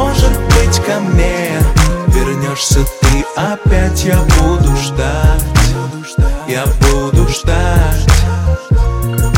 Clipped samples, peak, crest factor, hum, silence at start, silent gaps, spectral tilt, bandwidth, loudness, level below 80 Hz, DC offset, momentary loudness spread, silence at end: under 0.1%; 0 dBFS; 10 dB; none; 0 s; none; -5 dB/octave; 17 kHz; -13 LUFS; -14 dBFS; under 0.1%; 5 LU; 0 s